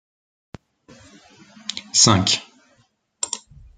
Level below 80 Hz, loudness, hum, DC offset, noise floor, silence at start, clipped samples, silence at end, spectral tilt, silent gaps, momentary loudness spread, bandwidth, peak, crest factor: -56 dBFS; -18 LUFS; none; under 0.1%; -63 dBFS; 1.7 s; under 0.1%; 0.4 s; -2.5 dB/octave; none; 18 LU; 11 kHz; -2 dBFS; 22 dB